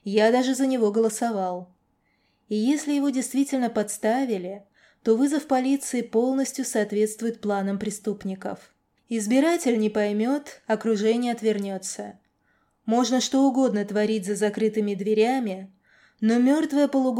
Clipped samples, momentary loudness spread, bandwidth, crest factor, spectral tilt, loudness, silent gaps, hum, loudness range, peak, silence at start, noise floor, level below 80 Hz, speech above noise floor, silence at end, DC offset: under 0.1%; 11 LU; 16 kHz; 16 dB; -4.5 dB/octave; -24 LUFS; none; none; 3 LU; -10 dBFS; 0.05 s; -69 dBFS; -72 dBFS; 45 dB; 0 s; under 0.1%